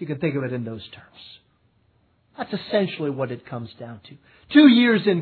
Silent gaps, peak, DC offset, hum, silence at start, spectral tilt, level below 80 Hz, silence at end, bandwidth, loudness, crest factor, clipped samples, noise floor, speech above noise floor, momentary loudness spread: none; -2 dBFS; under 0.1%; none; 0 s; -9 dB/octave; -66 dBFS; 0 s; 4.5 kHz; -20 LUFS; 22 dB; under 0.1%; -63 dBFS; 42 dB; 24 LU